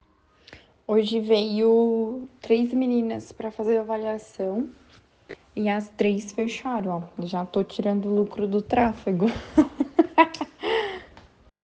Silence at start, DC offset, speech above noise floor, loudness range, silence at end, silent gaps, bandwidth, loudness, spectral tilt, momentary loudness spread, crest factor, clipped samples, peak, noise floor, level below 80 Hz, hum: 0.5 s; under 0.1%; 33 dB; 5 LU; 0.6 s; none; 8.6 kHz; -25 LUFS; -6.5 dB/octave; 11 LU; 22 dB; under 0.1%; -4 dBFS; -57 dBFS; -56 dBFS; none